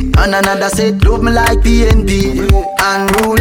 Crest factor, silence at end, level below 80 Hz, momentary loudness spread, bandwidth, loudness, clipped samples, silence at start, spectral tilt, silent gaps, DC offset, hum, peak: 10 dB; 0 s; -14 dBFS; 2 LU; 17.5 kHz; -12 LUFS; under 0.1%; 0 s; -5 dB/octave; none; under 0.1%; none; 0 dBFS